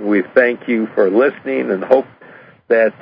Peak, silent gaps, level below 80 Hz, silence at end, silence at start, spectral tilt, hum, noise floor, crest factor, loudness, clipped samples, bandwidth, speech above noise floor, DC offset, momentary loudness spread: 0 dBFS; none; -66 dBFS; 0.1 s; 0 s; -8.5 dB/octave; none; -42 dBFS; 16 dB; -15 LUFS; under 0.1%; 5.2 kHz; 27 dB; under 0.1%; 6 LU